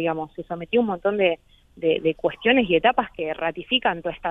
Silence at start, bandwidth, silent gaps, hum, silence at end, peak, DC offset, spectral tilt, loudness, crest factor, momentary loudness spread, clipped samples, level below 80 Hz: 0 s; 3.9 kHz; none; none; 0 s; -4 dBFS; under 0.1%; -7.5 dB/octave; -22 LUFS; 18 dB; 10 LU; under 0.1%; -54 dBFS